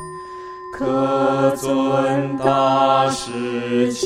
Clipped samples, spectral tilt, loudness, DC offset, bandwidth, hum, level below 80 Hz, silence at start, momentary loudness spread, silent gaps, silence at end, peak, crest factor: under 0.1%; -5.5 dB/octave; -18 LUFS; under 0.1%; 14.5 kHz; none; -54 dBFS; 0 s; 17 LU; none; 0 s; -2 dBFS; 16 dB